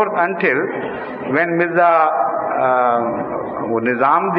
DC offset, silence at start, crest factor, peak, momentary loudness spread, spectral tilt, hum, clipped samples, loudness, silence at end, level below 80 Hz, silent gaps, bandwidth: under 0.1%; 0 s; 16 dB; -2 dBFS; 10 LU; -9.5 dB/octave; none; under 0.1%; -17 LUFS; 0 s; -58 dBFS; none; 5.2 kHz